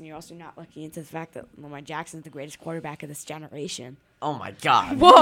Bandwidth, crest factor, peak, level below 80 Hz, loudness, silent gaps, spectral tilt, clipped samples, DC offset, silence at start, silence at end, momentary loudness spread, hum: 16.5 kHz; 22 dB; 0 dBFS; -54 dBFS; -24 LUFS; none; -4 dB/octave; under 0.1%; under 0.1%; 0.05 s; 0 s; 21 LU; none